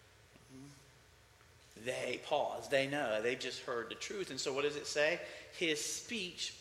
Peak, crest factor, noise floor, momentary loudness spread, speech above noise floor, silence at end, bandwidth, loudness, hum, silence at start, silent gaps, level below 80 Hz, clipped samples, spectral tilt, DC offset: -18 dBFS; 20 dB; -64 dBFS; 14 LU; 26 dB; 0 s; 16 kHz; -37 LUFS; none; 0.25 s; none; -74 dBFS; under 0.1%; -2.5 dB/octave; under 0.1%